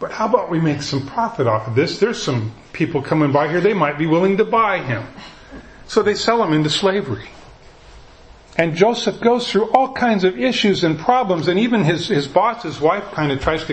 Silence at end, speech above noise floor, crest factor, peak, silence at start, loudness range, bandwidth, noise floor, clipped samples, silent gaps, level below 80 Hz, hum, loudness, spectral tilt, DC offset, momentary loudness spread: 0 s; 26 dB; 18 dB; 0 dBFS; 0 s; 3 LU; 8.8 kHz; -43 dBFS; under 0.1%; none; -46 dBFS; none; -18 LUFS; -5.5 dB/octave; under 0.1%; 7 LU